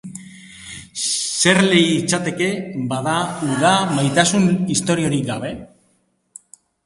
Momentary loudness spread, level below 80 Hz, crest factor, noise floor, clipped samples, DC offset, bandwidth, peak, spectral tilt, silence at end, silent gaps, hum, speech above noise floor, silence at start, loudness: 19 LU; -54 dBFS; 18 dB; -63 dBFS; under 0.1%; under 0.1%; 11.5 kHz; 0 dBFS; -4 dB/octave; 1.2 s; none; none; 46 dB; 0.05 s; -18 LUFS